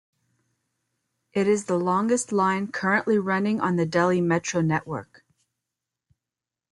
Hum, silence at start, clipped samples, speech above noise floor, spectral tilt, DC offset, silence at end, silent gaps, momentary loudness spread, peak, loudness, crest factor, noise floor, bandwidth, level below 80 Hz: none; 1.35 s; under 0.1%; 66 dB; -5.5 dB/octave; under 0.1%; 1.65 s; none; 4 LU; -8 dBFS; -24 LUFS; 18 dB; -89 dBFS; 11.5 kHz; -64 dBFS